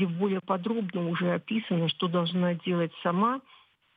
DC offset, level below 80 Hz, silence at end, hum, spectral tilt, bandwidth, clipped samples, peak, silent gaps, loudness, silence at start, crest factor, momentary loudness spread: under 0.1%; -82 dBFS; 0.55 s; none; -9.5 dB/octave; 4.9 kHz; under 0.1%; -14 dBFS; none; -29 LUFS; 0 s; 14 dB; 3 LU